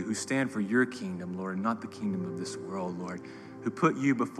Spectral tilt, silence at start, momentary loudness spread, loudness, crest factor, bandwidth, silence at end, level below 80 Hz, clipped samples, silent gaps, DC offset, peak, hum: -5.5 dB/octave; 0 s; 10 LU; -32 LUFS; 20 dB; 12.5 kHz; 0 s; -74 dBFS; under 0.1%; none; under 0.1%; -10 dBFS; none